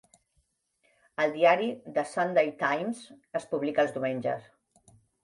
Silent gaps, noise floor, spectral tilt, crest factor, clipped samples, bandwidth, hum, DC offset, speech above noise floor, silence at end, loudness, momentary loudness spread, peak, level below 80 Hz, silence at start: none; -74 dBFS; -5.5 dB/octave; 20 dB; under 0.1%; 11.5 kHz; none; under 0.1%; 46 dB; 0.85 s; -28 LUFS; 14 LU; -10 dBFS; -76 dBFS; 1.2 s